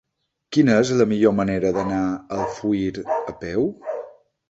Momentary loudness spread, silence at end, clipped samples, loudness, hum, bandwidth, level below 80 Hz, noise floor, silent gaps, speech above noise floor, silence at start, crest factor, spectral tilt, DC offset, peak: 10 LU; 0.4 s; under 0.1%; -21 LUFS; none; 8 kHz; -52 dBFS; -50 dBFS; none; 30 dB; 0.5 s; 18 dB; -6.5 dB/octave; under 0.1%; -4 dBFS